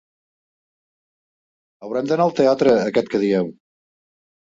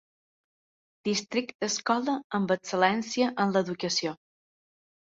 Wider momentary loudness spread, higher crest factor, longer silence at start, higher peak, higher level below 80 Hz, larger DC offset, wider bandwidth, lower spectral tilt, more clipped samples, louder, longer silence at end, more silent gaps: first, 10 LU vs 6 LU; about the same, 18 dB vs 22 dB; first, 1.8 s vs 1.05 s; about the same, -4 dBFS vs -6 dBFS; first, -62 dBFS vs -74 dBFS; neither; about the same, 7.8 kHz vs 8 kHz; first, -6.5 dB/octave vs -4 dB/octave; neither; first, -19 LUFS vs -28 LUFS; first, 1.05 s vs 0.9 s; second, none vs 1.54-1.59 s, 2.24-2.30 s